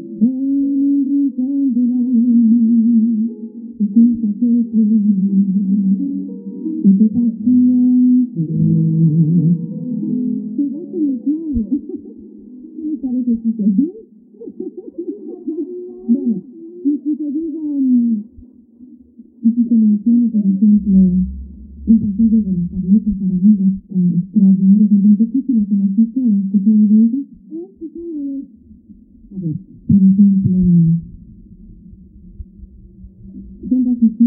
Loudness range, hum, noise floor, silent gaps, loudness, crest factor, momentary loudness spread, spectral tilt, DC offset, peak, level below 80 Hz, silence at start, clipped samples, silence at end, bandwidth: 8 LU; none; -43 dBFS; none; -15 LUFS; 14 dB; 16 LU; -19 dB/octave; under 0.1%; -2 dBFS; -42 dBFS; 0 s; under 0.1%; 0 s; 0.8 kHz